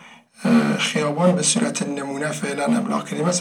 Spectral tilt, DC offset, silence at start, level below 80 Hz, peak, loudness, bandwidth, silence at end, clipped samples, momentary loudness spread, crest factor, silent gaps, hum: -4 dB/octave; under 0.1%; 0 s; -84 dBFS; -4 dBFS; -21 LUFS; 15.5 kHz; 0 s; under 0.1%; 8 LU; 16 dB; none; none